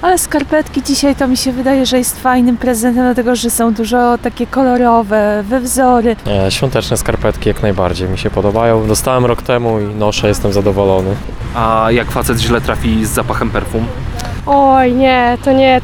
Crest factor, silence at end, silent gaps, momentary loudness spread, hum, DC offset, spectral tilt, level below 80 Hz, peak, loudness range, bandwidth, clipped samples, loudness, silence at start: 12 dB; 0 s; none; 6 LU; none; under 0.1%; -5 dB/octave; -26 dBFS; 0 dBFS; 2 LU; 19.5 kHz; under 0.1%; -13 LUFS; 0 s